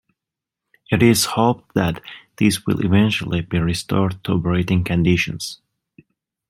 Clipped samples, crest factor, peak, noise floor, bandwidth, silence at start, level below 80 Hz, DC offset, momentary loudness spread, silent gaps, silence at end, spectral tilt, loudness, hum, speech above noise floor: under 0.1%; 18 dB; -2 dBFS; -86 dBFS; 16.5 kHz; 0.9 s; -46 dBFS; under 0.1%; 8 LU; none; 0.95 s; -5.5 dB/octave; -19 LUFS; none; 67 dB